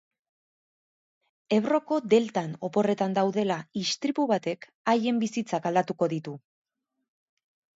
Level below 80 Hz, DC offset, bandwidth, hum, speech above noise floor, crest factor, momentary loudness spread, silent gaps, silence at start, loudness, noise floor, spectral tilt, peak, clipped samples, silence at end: -76 dBFS; under 0.1%; 8 kHz; none; over 64 dB; 20 dB; 8 LU; 4.75-4.85 s; 1.5 s; -27 LUFS; under -90 dBFS; -5.5 dB/octave; -8 dBFS; under 0.1%; 1.35 s